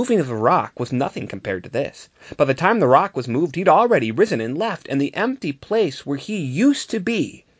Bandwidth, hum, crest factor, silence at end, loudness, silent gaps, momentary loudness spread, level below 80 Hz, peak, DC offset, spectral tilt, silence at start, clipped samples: 8 kHz; none; 20 dB; 0.25 s; -20 LUFS; none; 11 LU; -58 dBFS; 0 dBFS; under 0.1%; -6 dB/octave; 0 s; under 0.1%